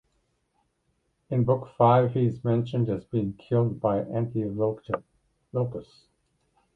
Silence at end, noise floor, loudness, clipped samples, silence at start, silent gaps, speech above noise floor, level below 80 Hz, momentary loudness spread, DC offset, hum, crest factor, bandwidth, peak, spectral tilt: 0.95 s; -73 dBFS; -26 LUFS; under 0.1%; 1.3 s; none; 48 dB; -58 dBFS; 12 LU; under 0.1%; none; 22 dB; 4.6 kHz; -6 dBFS; -10.5 dB/octave